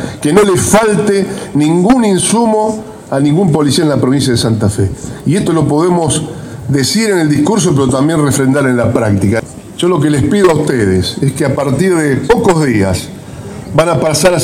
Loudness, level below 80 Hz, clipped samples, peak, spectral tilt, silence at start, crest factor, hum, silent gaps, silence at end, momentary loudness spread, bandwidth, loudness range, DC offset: -11 LUFS; -36 dBFS; under 0.1%; 0 dBFS; -5.5 dB/octave; 0 s; 10 dB; none; none; 0 s; 7 LU; 16.5 kHz; 2 LU; under 0.1%